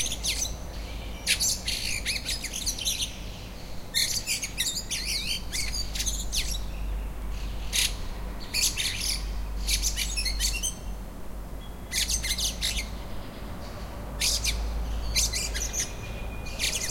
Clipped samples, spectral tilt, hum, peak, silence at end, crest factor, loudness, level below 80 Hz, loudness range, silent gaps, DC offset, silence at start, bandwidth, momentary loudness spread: under 0.1%; -1 dB/octave; none; -10 dBFS; 0 s; 20 dB; -28 LUFS; -36 dBFS; 2 LU; none; under 0.1%; 0 s; 16.5 kHz; 14 LU